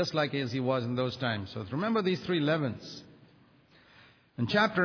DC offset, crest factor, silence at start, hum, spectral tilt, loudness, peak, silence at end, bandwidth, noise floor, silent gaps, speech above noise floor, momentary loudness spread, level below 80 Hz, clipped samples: under 0.1%; 18 dB; 0 s; none; -6.5 dB/octave; -30 LUFS; -12 dBFS; 0 s; 5.4 kHz; -61 dBFS; none; 31 dB; 12 LU; -68 dBFS; under 0.1%